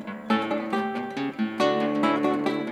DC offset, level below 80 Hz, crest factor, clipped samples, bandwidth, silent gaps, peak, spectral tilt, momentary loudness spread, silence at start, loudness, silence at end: under 0.1%; -70 dBFS; 16 dB; under 0.1%; 13 kHz; none; -10 dBFS; -6 dB/octave; 6 LU; 0 s; -26 LUFS; 0 s